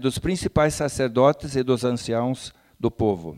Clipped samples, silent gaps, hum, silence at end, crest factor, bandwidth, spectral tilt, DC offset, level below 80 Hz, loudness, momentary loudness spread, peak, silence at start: under 0.1%; none; none; 0 s; 18 dB; 16 kHz; -6 dB/octave; under 0.1%; -44 dBFS; -23 LUFS; 9 LU; -6 dBFS; 0 s